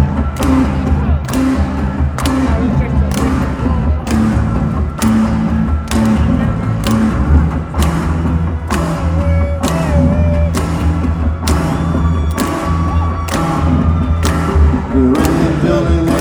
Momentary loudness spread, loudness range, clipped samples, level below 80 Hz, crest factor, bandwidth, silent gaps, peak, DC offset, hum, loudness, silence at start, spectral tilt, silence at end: 4 LU; 1 LU; under 0.1%; -18 dBFS; 12 dB; over 20 kHz; none; 0 dBFS; under 0.1%; none; -14 LUFS; 0 s; -7 dB/octave; 0 s